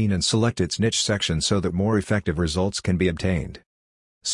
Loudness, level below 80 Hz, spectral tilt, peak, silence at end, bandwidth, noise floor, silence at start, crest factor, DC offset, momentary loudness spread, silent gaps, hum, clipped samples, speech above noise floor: -23 LUFS; -44 dBFS; -4.5 dB/octave; -8 dBFS; 0 s; 11 kHz; under -90 dBFS; 0 s; 16 dB; under 0.1%; 5 LU; 3.66-4.21 s; none; under 0.1%; over 68 dB